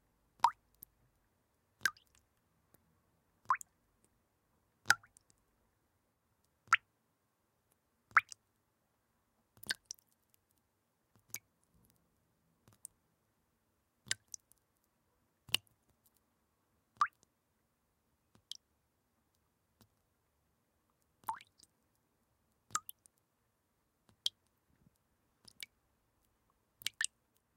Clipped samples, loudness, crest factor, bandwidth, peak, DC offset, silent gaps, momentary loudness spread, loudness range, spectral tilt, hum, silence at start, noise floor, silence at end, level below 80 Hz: under 0.1%; -38 LUFS; 40 dB; 16 kHz; -6 dBFS; under 0.1%; none; 22 LU; 17 LU; 1 dB/octave; none; 0.45 s; -81 dBFS; 0.5 s; -84 dBFS